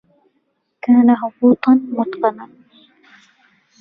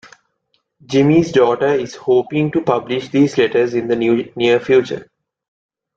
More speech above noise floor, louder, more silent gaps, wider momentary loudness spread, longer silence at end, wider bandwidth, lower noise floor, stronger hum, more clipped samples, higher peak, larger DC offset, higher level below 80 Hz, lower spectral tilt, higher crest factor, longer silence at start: about the same, 53 dB vs 52 dB; about the same, -15 LUFS vs -16 LUFS; neither; first, 11 LU vs 7 LU; first, 1.35 s vs 0.95 s; second, 4.9 kHz vs 7.8 kHz; about the same, -68 dBFS vs -67 dBFS; neither; neither; about the same, -2 dBFS vs -2 dBFS; neither; second, -64 dBFS vs -56 dBFS; first, -9 dB/octave vs -6.5 dB/octave; about the same, 16 dB vs 14 dB; about the same, 0.85 s vs 0.9 s